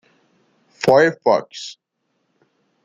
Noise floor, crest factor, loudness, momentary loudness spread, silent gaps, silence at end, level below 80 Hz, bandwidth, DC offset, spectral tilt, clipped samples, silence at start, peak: -71 dBFS; 20 dB; -16 LUFS; 19 LU; none; 1.1 s; -64 dBFS; 12.5 kHz; under 0.1%; -5 dB/octave; under 0.1%; 0.8 s; -2 dBFS